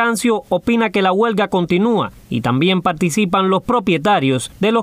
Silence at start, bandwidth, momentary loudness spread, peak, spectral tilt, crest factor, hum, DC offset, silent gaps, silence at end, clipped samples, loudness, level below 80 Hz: 0 s; 16 kHz; 4 LU; -4 dBFS; -5.5 dB/octave; 12 dB; none; under 0.1%; none; 0 s; under 0.1%; -16 LUFS; -48 dBFS